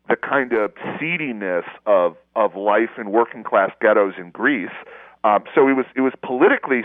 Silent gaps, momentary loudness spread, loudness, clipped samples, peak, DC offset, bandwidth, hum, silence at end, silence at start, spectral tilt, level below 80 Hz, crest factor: none; 8 LU; -19 LUFS; under 0.1%; -2 dBFS; under 0.1%; 3.9 kHz; none; 0 s; 0.1 s; -9 dB/octave; -70 dBFS; 18 dB